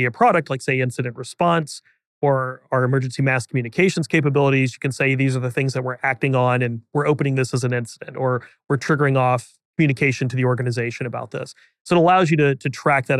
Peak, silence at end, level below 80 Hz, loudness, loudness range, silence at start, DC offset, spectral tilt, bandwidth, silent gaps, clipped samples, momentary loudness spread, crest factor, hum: -6 dBFS; 0 s; -66 dBFS; -20 LUFS; 2 LU; 0 s; under 0.1%; -6.5 dB/octave; 12 kHz; 2.06-2.21 s, 9.65-9.74 s, 11.81-11.85 s; under 0.1%; 9 LU; 14 dB; none